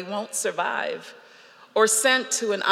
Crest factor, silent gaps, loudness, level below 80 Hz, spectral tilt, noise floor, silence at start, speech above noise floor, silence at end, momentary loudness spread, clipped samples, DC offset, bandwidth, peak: 22 dB; none; -23 LUFS; under -90 dBFS; -0.5 dB/octave; -51 dBFS; 0 s; 27 dB; 0 s; 11 LU; under 0.1%; under 0.1%; 16 kHz; -4 dBFS